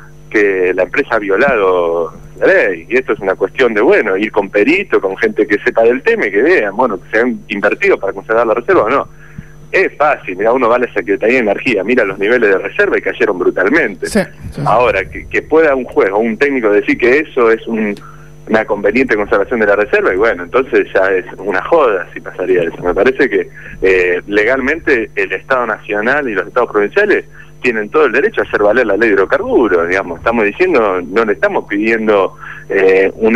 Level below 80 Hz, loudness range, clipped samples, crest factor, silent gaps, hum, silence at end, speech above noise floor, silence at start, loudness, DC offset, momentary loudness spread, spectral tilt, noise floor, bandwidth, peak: -40 dBFS; 2 LU; under 0.1%; 12 dB; none; none; 0 s; 21 dB; 0 s; -12 LUFS; 1%; 6 LU; -6 dB/octave; -33 dBFS; 12 kHz; -2 dBFS